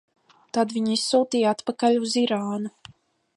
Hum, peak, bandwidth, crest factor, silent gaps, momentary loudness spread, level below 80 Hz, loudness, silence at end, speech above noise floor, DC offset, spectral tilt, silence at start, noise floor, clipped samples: none; -8 dBFS; 11.5 kHz; 16 dB; none; 9 LU; -72 dBFS; -23 LUFS; 0.65 s; 33 dB; under 0.1%; -4 dB/octave; 0.55 s; -56 dBFS; under 0.1%